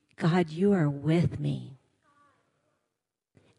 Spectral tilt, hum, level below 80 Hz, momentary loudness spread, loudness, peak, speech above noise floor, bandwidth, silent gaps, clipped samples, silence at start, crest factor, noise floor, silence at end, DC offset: -8.5 dB/octave; none; -62 dBFS; 10 LU; -27 LUFS; -12 dBFS; 60 dB; 10.5 kHz; none; under 0.1%; 0.2 s; 18 dB; -86 dBFS; 1.85 s; under 0.1%